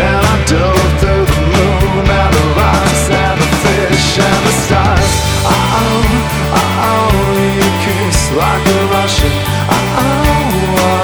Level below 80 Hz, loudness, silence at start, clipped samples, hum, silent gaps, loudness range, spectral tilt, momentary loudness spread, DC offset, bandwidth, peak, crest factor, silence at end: -18 dBFS; -11 LUFS; 0 s; under 0.1%; none; none; 1 LU; -5 dB/octave; 2 LU; under 0.1%; over 20 kHz; 0 dBFS; 10 dB; 0 s